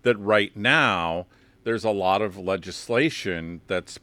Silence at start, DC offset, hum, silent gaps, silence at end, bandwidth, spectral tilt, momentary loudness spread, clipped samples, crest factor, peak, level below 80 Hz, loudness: 0.05 s; under 0.1%; none; none; 0.05 s; 15.5 kHz; -4.5 dB/octave; 11 LU; under 0.1%; 20 dB; -4 dBFS; -60 dBFS; -24 LUFS